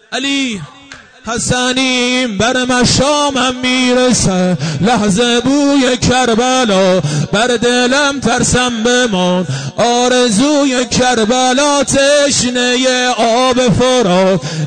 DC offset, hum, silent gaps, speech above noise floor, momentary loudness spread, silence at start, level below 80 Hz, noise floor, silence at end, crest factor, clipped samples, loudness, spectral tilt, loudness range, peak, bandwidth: 0.4%; none; none; 25 dB; 4 LU; 0.1 s; -38 dBFS; -36 dBFS; 0 s; 8 dB; under 0.1%; -11 LUFS; -3.5 dB/octave; 2 LU; -4 dBFS; 9.6 kHz